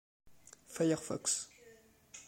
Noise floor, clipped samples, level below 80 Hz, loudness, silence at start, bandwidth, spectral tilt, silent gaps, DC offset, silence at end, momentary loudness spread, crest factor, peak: -62 dBFS; under 0.1%; -74 dBFS; -35 LUFS; 0.25 s; 16.5 kHz; -3.5 dB/octave; none; under 0.1%; 0.05 s; 16 LU; 20 dB; -20 dBFS